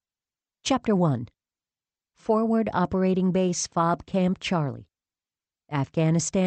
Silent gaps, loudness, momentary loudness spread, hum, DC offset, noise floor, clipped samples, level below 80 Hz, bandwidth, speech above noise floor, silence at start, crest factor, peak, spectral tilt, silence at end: none; -25 LUFS; 9 LU; none; under 0.1%; under -90 dBFS; under 0.1%; -56 dBFS; 8.8 kHz; over 66 dB; 0.65 s; 16 dB; -10 dBFS; -6 dB/octave; 0 s